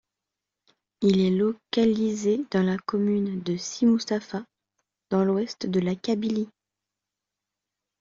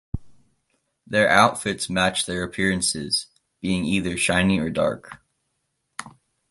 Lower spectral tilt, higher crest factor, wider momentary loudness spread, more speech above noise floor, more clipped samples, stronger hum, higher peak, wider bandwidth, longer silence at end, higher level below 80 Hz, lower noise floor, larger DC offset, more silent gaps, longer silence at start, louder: first, -6.5 dB/octave vs -3.5 dB/octave; second, 16 dB vs 22 dB; second, 8 LU vs 19 LU; first, 63 dB vs 53 dB; neither; neither; second, -10 dBFS vs -2 dBFS; second, 7.6 kHz vs 11.5 kHz; first, 1.5 s vs 0.4 s; second, -64 dBFS vs -46 dBFS; first, -87 dBFS vs -75 dBFS; neither; neither; first, 1 s vs 0.15 s; second, -25 LUFS vs -22 LUFS